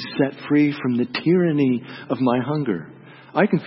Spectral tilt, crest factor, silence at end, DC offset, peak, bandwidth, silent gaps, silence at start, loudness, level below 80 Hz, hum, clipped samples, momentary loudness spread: -11.5 dB/octave; 16 dB; 0 s; under 0.1%; -4 dBFS; 5.8 kHz; none; 0 s; -21 LUFS; -66 dBFS; none; under 0.1%; 9 LU